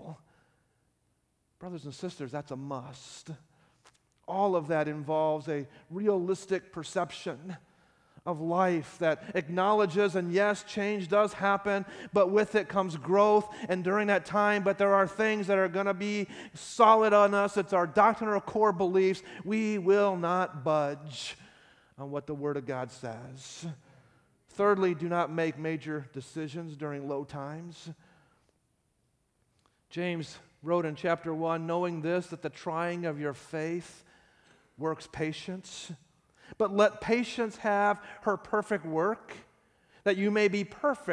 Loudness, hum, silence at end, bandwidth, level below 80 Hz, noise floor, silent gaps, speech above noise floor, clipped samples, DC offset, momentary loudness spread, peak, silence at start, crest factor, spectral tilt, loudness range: -29 LUFS; none; 0 s; 10.5 kHz; -70 dBFS; -75 dBFS; none; 45 dB; under 0.1%; under 0.1%; 17 LU; -8 dBFS; 0 s; 22 dB; -6 dB/octave; 14 LU